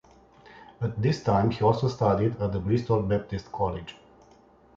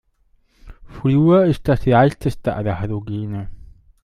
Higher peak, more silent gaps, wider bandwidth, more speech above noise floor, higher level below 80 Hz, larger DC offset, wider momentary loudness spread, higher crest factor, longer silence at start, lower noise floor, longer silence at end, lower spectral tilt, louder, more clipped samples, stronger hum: second, -8 dBFS vs -2 dBFS; neither; second, 7.4 kHz vs 13 kHz; second, 31 dB vs 42 dB; second, -48 dBFS vs -38 dBFS; neither; second, 10 LU vs 13 LU; about the same, 18 dB vs 16 dB; second, 0.5 s vs 0.65 s; about the same, -56 dBFS vs -59 dBFS; first, 0.85 s vs 0.4 s; about the same, -8 dB/octave vs -9 dB/octave; second, -26 LUFS vs -18 LUFS; neither; neither